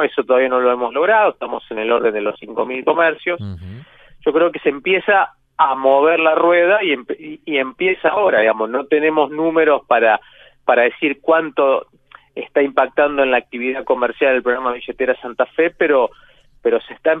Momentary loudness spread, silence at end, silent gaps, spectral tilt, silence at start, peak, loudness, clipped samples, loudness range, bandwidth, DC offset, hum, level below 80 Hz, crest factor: 9 LU; 0 s; none; -8 dB/octave; 0 s; 0 dBFS; -16 LUFS; under 0.1%; 3 LU; 4 kHz; under 0.1%; none; -56 dBFS; 16 dB